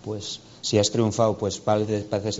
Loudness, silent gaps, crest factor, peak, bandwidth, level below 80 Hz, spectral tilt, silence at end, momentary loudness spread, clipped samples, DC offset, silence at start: -24 LUFS; none; 18 dB; -6 dBFS; 8 kHz; -58 dBFS; -5.5 dB/octave; 0 s; 10 LU; under 0.1%; under 0.1%; 0.05 s